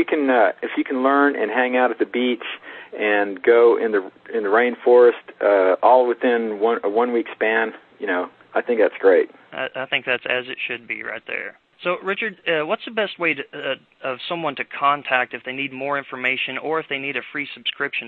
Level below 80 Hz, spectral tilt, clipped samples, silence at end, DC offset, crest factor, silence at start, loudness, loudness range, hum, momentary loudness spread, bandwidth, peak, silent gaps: -72 dBFS; -7.5 dB/octave; under 0.1%; 0 s; under 0.1%; 18 dB; 0 s; -20 LUFS; 7 LU; none; 12 LU; 4.4 kHz; -2 dBFS; none